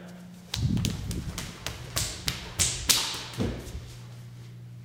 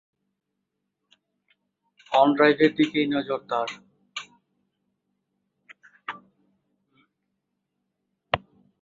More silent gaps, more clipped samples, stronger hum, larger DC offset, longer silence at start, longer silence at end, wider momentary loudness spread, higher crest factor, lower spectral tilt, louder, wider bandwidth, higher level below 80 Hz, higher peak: neither; neither; neither; neither; second, 0 s vs 2.1 s; second, 0 s vs 0.45 s; about the same, 21 LU vs 20 LU; first, 32 dB vs 26 dB; second, -2.5 dB/octave vs -5.5 dB/octave; second, -29 LUFS vs -23 LUFS; first, 18 kHz vs 7.6 kHz; first, -44 dBFS vs -64 dBFS; first, 0 dBFS vs -4 dBFS